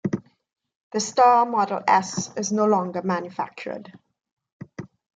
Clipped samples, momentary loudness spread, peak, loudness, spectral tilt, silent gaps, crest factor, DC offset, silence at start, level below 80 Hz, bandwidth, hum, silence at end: under 0.1%; 21 LU; -6 dBFS; -22 LUFS; -4.5 dB/octave; 0.76-0.91 s, 4.32-4.37 s, 4.52-4.60 s; 18 dB; under 0.1%; 0.05 s; -70 dBFS; 9.4 kHz; none; 0.3 s